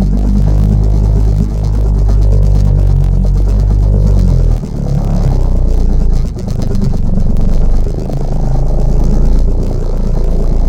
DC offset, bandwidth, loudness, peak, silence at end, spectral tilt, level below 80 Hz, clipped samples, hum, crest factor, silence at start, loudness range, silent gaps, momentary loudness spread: under 0.1%; 7.6 kHz; -13 LUFS; 0 dBFS; 0 s; -9 dB/octave; -10 dBFS; under 0.1%; none; 8 dB; 0 s; 4 LU; none; 6 LU